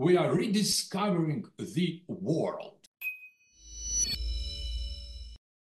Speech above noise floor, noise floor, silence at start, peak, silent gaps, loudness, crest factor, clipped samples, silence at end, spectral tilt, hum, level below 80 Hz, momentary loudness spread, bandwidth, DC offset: 26 dB; -55 dBFS; 0 s; -12 dBFS; 2.87-2.92 s; -31 LUFS; 18 dB; under 0.1%; 0.3 s; -4 dB/octave; none; -42 dBFS; 19 LU; 14 kHz; under 0.1%